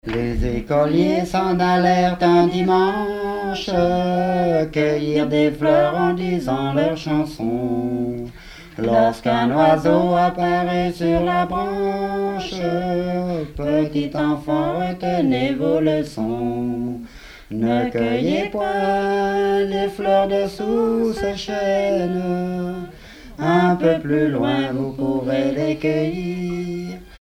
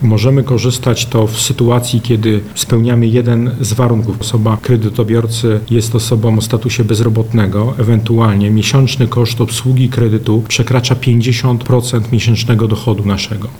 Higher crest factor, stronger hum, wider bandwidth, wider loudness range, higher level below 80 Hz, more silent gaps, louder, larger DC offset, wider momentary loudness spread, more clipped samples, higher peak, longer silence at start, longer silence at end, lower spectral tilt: first, 16 dB vs 10 dB; neither; about the same, 15.5 kHz vs 16.5 kHz; first, 4 LU vs 1 LU; about the same, -40 dBFS vs -38 dBFS; neither; second, -20 LUFS vs -12 LUFS; second, under 0.1% vs 1%; first, 8 LU vs 4 LU; neither; about the same, -4 dBFS vs -2 dBFS; about the same, 0.05 s vs 0 s; about the same, 0.05 s vs 0 s; about the same, -7 dB/octave vs -6 dB/octave